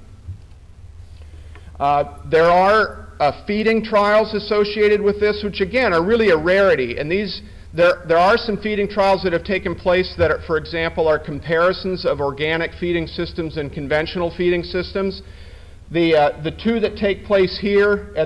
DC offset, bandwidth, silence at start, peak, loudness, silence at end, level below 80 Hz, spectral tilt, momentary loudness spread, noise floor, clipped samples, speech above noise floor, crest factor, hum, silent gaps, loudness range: under 0.1%; 11 kHz; 0 s; -6 dBFS; -18 LUFS; 0 s; -40 dBFS; -6.5 dB/octave; 9 LU; -41 dBFS; under 0.1%; 23 dB; 12 dB; none; none; 5 LU